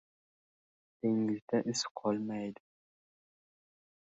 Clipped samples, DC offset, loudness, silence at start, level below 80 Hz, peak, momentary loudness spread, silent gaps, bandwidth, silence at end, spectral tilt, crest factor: under 0.1%; under 0.1%; -35 LUFS; 1.05 s; -80 dBFS; -18 dBFS; 7 LU; 1.42-1.48 s, 1.91-1.95 s; 8.2 kHz; 1.55 s; -5 dB/octave; 20 dB